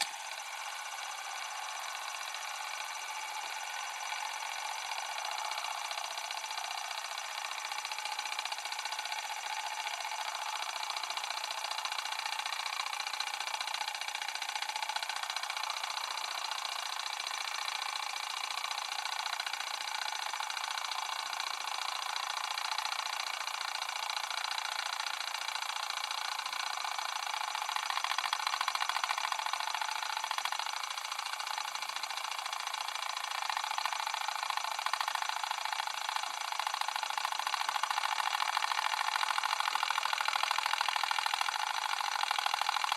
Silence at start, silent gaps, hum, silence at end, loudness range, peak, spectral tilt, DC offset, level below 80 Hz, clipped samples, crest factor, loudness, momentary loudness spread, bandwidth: 0 s; none; none; 0 s; 5 LU; -12 dBFS; 4.5 dB/octave; under 0.1%; under -90 dBFS; under 0.1%; 24 dB; -35 LUFS; 6 LU; 16 kHz